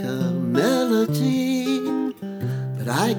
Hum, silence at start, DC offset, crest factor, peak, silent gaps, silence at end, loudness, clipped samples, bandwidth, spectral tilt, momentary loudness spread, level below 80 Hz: none; 0 s; under 0.1%; 16 dB; -6 dBFS; none; 0 s; -22 LUFS; under 0.1%; over 20 kHz; -6 dB/octave; 8 LU; -66 dBFS